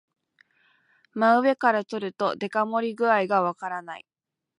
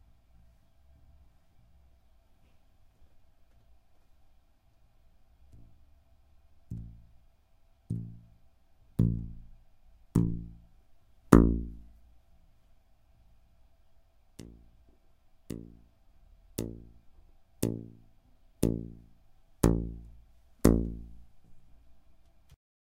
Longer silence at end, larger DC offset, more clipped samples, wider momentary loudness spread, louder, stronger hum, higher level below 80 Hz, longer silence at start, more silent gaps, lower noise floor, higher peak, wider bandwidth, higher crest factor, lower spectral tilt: second, 0.6 s vs 1.05 s; neither; neither; second, 15 LU vs 27 LU; first, -24 LUFS vs -31 LUFS; neither; second, -80 dBFS vs -42 dBFS; second, 1.15 s vs 6.7 s; neither; about the same, -65 dBFS vs -63 dBFS; second, -6 dBFS vs -2 dBFS; second, 11 kHz vs 15.5 kHz; second, 20 dB vs 34 dB; second, -6 dB/octave vs -7.5 dB/octave